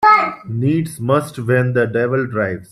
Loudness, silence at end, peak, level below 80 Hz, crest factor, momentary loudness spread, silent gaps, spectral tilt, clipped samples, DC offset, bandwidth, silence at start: -17 LUFS; 0.1 s; -2 dBFS; -56 dBFS; 14 dB; 6 LU; none; -7 dB/octave; under 0.1%; under 0.1%; 13.5 kHz; 0 s